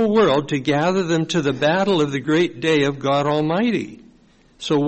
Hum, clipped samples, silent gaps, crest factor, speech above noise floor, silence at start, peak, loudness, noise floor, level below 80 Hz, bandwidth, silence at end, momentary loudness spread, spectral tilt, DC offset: none; under 0.1%; none; 12 dB; 34 dB; 0 s; -8 dBFS; -19 LUFS; -53 dBFS; -54 dBFS; 8.4 kHz; 0 s; 5 LU; -6 dB/octave; under 0.1%